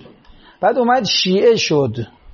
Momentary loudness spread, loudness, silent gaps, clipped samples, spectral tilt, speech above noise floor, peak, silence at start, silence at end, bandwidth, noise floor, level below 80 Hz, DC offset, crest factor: 7 LU; -15 LUFS; none; under 0.1%; -3 dB/octave; 30 dB; -2 dBFS; 0.6 s; 0 s; 7.2 kHz; -45 dBFS; -52 dBFS; under 0.1%; 14 dB